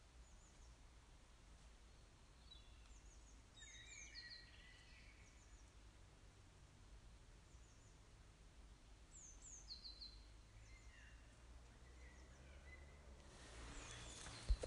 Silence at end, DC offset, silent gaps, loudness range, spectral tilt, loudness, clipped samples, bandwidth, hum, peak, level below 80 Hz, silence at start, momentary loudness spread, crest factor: 0 s; under 0.1%; none; 6 LU; -3 dB/octave; -61 LUFS; under 0.1%; 11.5 kHz; none; -30 dBFS; -60 dBFS; 0 s; 12 LU; 28 dB